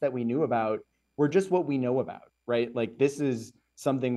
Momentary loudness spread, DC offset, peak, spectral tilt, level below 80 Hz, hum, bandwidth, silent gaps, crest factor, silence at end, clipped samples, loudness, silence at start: 11 LU; under 0.1%; -12 dBFS; -7 dB/octave; -72 dBFS; none; 12.5 kHz; none; 16 dB; 0 s; under 0.1%; -29 LUFS; 0 s